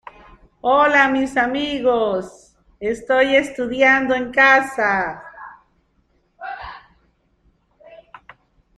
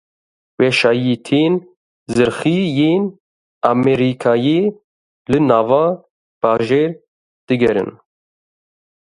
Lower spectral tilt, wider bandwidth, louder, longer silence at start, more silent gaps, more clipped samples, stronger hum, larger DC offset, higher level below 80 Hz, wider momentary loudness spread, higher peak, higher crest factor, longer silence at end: second, -4 dB/octave vs -6.5 dB/octave; about the same, 11.5 kHz vs 11.5 kHz; about the same, -17 LUFS vs -16 LUFS; about the same, 0.65 s vs 0.6 s; second, none vs 1.77-2.06 s, 3.20-3.61 s, 4.84-5.25 s, 6.10-6.41 s, 7.08-7.47 s; neither; neither; neither; about the same, -52 dBFS vs -52 dBFS; first, 22 LU vs 8 LU; about the same, -2 dBFS vs 0 dBFS; about the same, 18 dB vs 16 dB; second, 0.85 s vs 1.1 s